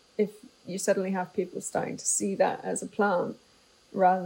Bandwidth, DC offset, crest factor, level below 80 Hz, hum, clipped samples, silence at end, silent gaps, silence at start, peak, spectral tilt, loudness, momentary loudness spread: 16 kHz; under 0.1%; 18 dB; -76 dBFS; none; under 0.1%; 0 s; none; 0.2 s; -10 dBFS; -4 dB/octave; -29 LUFS; 12 LU